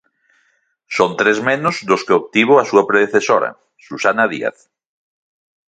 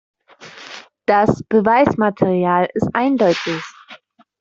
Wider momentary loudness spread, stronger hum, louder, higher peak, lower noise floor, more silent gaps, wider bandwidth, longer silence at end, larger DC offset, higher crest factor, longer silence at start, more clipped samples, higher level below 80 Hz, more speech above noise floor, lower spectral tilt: second, 12 LU vs 20 LU; neither; about the same, -15 LUFS vs -17 LUFS; about the same, 0 dBFS vs -2 dBFS; first, -62 dBFS vs -44 dBFS; neither; first, 9 kHz vs 7.8 kHz; first, 1.15 s vs 0.45 s; neither; about the same, 18 dB vs 16 dB; first, 0.9 s vs 0.4 s; neither; second, -62 dBFS vs -52 dBFS; first, 47 dB vs 29 dB; second, -4.5 dB/octave vs -6.5 dB/octave